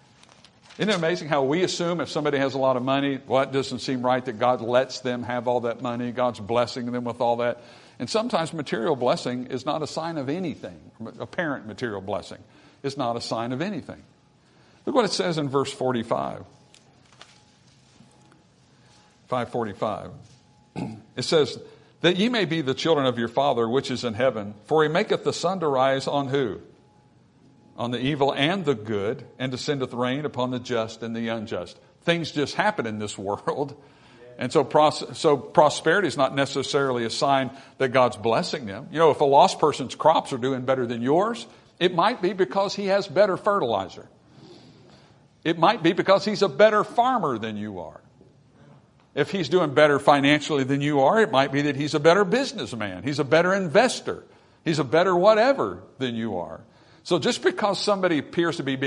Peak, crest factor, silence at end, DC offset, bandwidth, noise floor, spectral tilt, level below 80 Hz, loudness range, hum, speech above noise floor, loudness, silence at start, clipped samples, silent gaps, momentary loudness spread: -2 dBFS; 22 dB; 0 s; under 0.1%; 11 kHz; -58 dBFS; -5 dB/octave; -66 dBFS; 9 LU; none; 34 dB; -24 LUFS; 0.7 s; under 0.1%; none; 13 LU